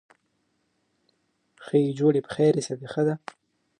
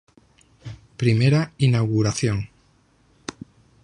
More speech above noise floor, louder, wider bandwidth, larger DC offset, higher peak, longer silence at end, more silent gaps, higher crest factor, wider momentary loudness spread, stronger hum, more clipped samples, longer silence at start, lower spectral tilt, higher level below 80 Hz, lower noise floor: first, 49 dB vs 40 dB; second, -25 LUFS vs -21 LUFS; about the same, 10.5 kHz vs 11 kHz; neither; second, -10 dBFS vs -6 dBFS; second, 0.65 s vs 1.35 s; neither; about the same, 18 dB vs 18 dB; second, 10 LU vs 22 LU; neither; neither; first, 1.6 s vs 0.65 s; about the same, -7 dB/octave vs -6 dB/octave; second, -70 dBFS vs -50 dBFS; first, -73 dBFS vs -60 dBFS